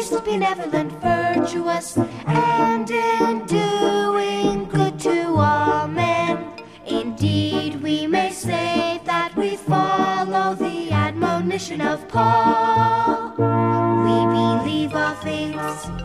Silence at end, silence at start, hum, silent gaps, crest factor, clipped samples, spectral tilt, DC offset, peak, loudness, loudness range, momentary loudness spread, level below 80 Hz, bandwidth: 0 s; 0 s; none; none; 14 dB; under 0.1%; -6 dB/octave; 0.1%; -6 dBFS; -20 LUFS; 3 LU; 7 LU; -50 dBFS; 14.5 kHz